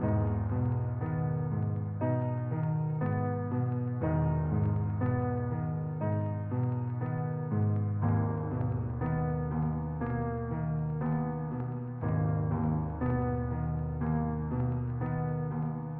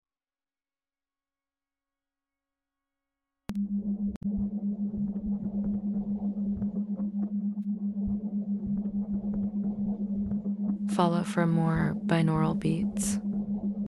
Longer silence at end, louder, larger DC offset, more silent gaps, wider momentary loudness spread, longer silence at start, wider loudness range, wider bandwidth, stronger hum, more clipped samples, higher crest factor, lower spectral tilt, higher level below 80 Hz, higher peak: about the same, 0 s vs 0 s; about the same, -32 LUFS vs -30 LUFS; neither; second, none vs 4.16-4.21 s; about the same, 4 LU vs 6 LU; second, 0 s vs 3.5 s; second, 2 LU vs 8 LU; second, 3 kHz vs 12.5 kHz; neither; neither; second, 12 dB vs 20 dB; first, -11.5 dB/octave vs -7 dB/octave; first, -46 dBFS vs -52 dBFS; second, -18 dBFS vs -10 dBFS